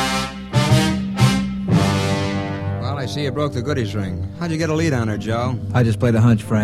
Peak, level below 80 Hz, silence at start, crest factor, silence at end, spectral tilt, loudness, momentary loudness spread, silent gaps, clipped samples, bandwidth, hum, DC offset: -2 dBFS; -40 dBFS; 0 s; 18 dB; 0 s; -6 dB/octave; -20 LUFS; 8 LU; none; under 0.1%; 14.5 kHz; none; 0.1%